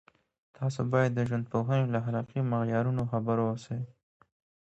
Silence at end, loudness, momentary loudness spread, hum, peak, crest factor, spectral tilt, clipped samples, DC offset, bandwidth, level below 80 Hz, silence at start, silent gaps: 0.75 s; -30 LUFS; 8 LU; none; -14 dBFS; 18 dB; -8.5 dB/octave; under 0.1%; under 0.1%; 8 kHz; -64 dBFS; 0.6 s; none